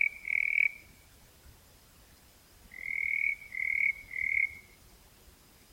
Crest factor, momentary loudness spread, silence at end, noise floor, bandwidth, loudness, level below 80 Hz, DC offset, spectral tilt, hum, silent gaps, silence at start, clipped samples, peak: 22 dB; 16 LU; 1.1 s; -59 dBFS; 16.5 kHz; -29 LUFS; -62 dBFS; under 0.1%; -2 dB/octave; none; none; 0 s; under 0.1%; -14 dBFS